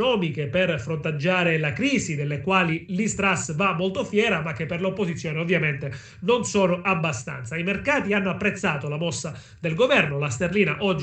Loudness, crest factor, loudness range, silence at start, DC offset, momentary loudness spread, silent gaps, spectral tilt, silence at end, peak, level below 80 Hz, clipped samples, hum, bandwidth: -23 LUFS; 18 dB; 2 LU; 0 s; under 0.1%; 7 LU; none; -5 dB/octave; 0 s; -6 dBFS; -54 dBFS; under 0.1%; none; 9.2 kHz